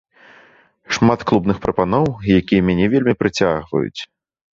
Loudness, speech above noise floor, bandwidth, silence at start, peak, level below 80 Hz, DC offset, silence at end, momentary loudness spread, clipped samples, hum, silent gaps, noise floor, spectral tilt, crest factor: -17 LUFS; 34 dB; 7.6 kHz; 0.9 s; -2 dBFS; -42 dBFS; under 0.1%; 0.5 s; 8 LU; under 0.1%; none; none; -51 dBFS; -6.5 dB/octave; 16 dB